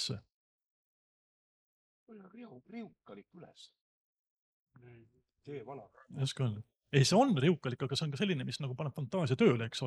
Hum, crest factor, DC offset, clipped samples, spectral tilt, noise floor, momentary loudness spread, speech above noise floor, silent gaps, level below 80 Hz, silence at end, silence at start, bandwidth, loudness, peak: none; 22 dB; under 0.1%; under 0.1%; -5.5 dB/octave; under -90 dBFS; 25 LU; over 56 dB; 0.34-0.59 s, 0.70-2.07 s, 3.81-4.13 s, 4.19-4.24 s, 4.30-4.67 s; -76 dBFS; 0 s; 0 s; 12.5 kHz; -32 LUFS; -14 dBFS